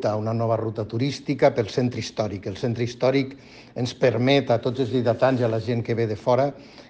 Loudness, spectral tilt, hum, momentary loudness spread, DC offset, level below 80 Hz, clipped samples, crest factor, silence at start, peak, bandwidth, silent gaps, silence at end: -23 LUFS; -6.5 dB/octave; none; 8 LU; under 0.1%; -58 dBFS; under 0.1%; 18 dB; 0 s; -6 dBFS; 8.6 kHz; none; 0.05 s